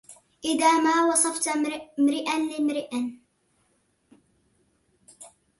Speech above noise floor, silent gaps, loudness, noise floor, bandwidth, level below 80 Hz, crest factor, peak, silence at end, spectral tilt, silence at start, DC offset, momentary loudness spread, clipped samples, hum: 45 dB; none; -24 LUFS; -69 dBFS; 12 kHz; -72 dBFS; 18 dB; -8 dBFS; 0.3 s; -1.5 dB/octave; 0.1 s; under 0.1%; 11 LU; under 0.1%; none